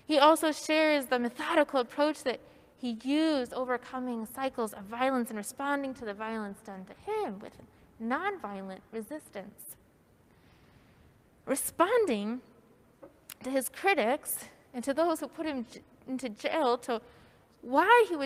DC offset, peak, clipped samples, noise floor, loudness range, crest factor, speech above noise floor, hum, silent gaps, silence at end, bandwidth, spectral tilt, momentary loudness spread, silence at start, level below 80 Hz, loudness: under 0.1%; -8 dBFS; under 0.1%; -63 dBFS; 10 LU; 24 dB; 33 dB; none; none; 0 s; 16 kHz; -3 dB/octave; 17 LU; 0.1 s; -70 dBFS; -30 LUFS